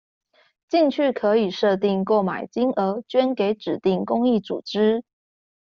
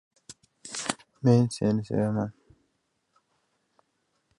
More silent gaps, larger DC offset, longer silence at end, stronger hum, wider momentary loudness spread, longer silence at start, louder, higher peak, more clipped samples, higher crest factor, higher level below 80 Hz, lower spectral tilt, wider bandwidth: neither; neither; second, 0.75 s vs 2.05 s; neither; second, 4 LU vs 14 LU; first, 0.7 s vs 0.3 s; first, -22 LUFS vs -27 LUFS; about the same, -6 dBFS vs -6 dBFS; neither; second, 16 dB vs 24 dB; about the same, -66 dBFS vs -62 dBFS; second, -5 dB/octave vs -6.5 dB/octave; second, 7 kHz vs 11.5 kHz